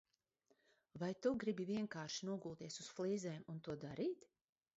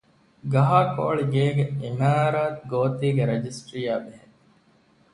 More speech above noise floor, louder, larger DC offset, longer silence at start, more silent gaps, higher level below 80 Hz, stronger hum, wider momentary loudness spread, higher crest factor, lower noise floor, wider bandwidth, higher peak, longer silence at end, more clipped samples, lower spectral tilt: about the same, 37 dB vs 37 dB; second, -45 LUFS vs -24 LUFS; neither; first, 0.95 s vs 0.45 s; neither; second, -80 dBFS vs -60 dBFS; neither; about the same, 9 LU vs 11 LU; about the same, 20 dB vs 18 dB; first, -81 dBFS vs -60 dBFS; second, 7.6 kHz vs 11 kHz; second, -26 dBFS vs -6 dBFS; second, 0.65 s vs 0.95 s; neither; second, -5.5 dB/octave vs -7.5 dB/octave